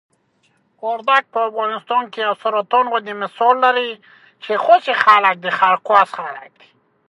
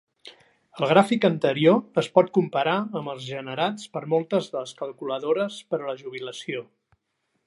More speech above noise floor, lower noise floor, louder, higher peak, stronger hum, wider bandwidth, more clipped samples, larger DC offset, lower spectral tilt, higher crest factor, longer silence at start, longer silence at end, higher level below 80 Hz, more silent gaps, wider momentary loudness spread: second, 45 dB vs 51 dB; second, -62 dBFS vs -75 dBFS; first, -16 LUFS vs -24 LUFS; about the same, 0 dBFS vs -2 dBFS; neither; about the same, 11 kHz vs 11.5 kHz; neither; neither; second, -4 dB/octave vs -6 dB/octave; about the same, 18 dB vs 22 dB; first, 0.85 s vs 0.25 s; second, 0.65 s vs 0.85 s; about the same, -72 dBFS vs -74 dBFS; neither; about the same, 15 LU vs 14 LU